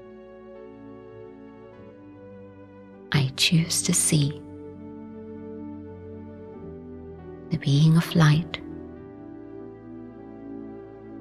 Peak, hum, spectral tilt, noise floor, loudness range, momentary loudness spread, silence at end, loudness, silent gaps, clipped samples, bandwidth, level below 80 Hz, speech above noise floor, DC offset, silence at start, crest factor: -6 dBFS; none; -4.5 dB/octave; -46 dBFS; 10 LU; 26 LU; 0 s; -22 LUFS; none; under 0.1%; 15 kHz; -56 dBFS; 25 dB; under 0.1%; 0 s; 22 dB